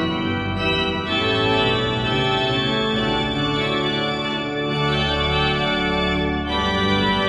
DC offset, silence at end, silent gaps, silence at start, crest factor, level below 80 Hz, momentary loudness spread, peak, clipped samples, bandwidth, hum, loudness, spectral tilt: under 0.1%; 0 s; none; 0 s; 14 dB; -36 dBFS; 4 LU; -6 dBFS; under 0.1%; 11 kHz; none; -20 LUFS; -5.5 dB/octave